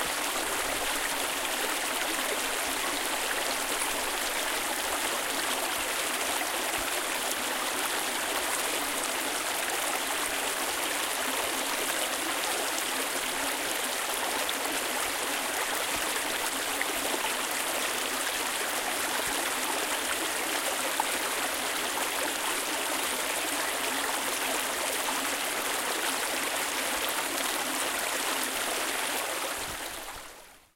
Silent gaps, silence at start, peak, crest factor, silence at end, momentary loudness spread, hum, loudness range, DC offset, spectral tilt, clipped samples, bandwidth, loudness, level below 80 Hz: none; 0 s; -12 dBFS; 18 dB; 0.15 s; 1 LU; none; 0 LU; under 0.1%; 0 dB/octave; under 0.1%; 17 kHz; -29 LUFS; -58 dBFS